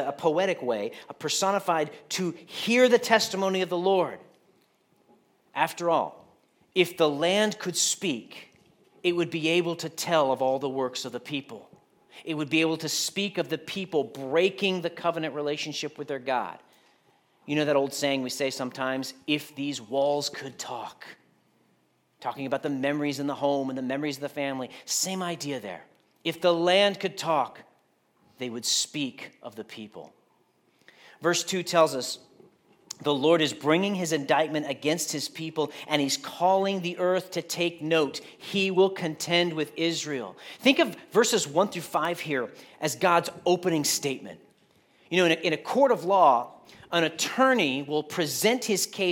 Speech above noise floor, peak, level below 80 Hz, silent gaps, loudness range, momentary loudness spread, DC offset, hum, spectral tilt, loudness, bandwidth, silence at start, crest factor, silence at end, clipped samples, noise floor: 41 dB; -4 dBFS; -80 dBFS; none; 6 LU; 13 LU; under 0.1%; none; -3.5 dB/octave; -26 LUFS; 17.5 kHz; 0 s; 24 dB; 0 s; under 0.1%; -68 dBFS